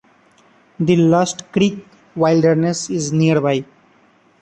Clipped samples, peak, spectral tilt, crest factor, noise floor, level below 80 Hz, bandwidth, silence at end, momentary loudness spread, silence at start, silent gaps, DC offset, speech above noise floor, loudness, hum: under 0.1%; -2 dBFS; -6 dB/octave; 16 dB; -54 dBFS; -56 dBFS; 9.2 kHz; 0.8 s; 9 LU; 0.8 s; none; under 0.1%; 38 dB; -17 LUFS; none